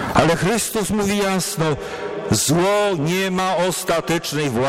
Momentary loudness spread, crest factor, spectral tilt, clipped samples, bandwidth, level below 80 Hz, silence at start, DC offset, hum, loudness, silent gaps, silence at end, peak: 5 LU; 14 dB; -4 dB/octave; under 0.1%; 16.5 kHz; -44 dBFS; 0 s; under 0.1%; none; -19 LUFS; none; 0 s; -4 dBFS